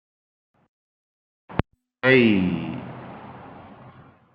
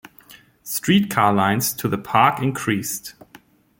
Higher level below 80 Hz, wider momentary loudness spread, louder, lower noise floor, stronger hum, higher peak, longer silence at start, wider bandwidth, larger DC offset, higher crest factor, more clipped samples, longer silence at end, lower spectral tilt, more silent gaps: first, -52 dBFS vs -58 dBFS; first, 26 LU vs 12 LU; about the same, -21 LUFS vs -20 LUFS; about the same, -49 dBFS vs -51 dBFS; neither; about the same, -2 dBFS vs -2 dBFS; first, 1.5 s vs 0.3 s; second, 5.6 kHz vs 17 kHz; neither; about the same, 24 dB vs 20 dB; neither; second, 0.45 s vs 0.7 s; first, -9.5 dB/octave vs -4.5 dB/octave; neither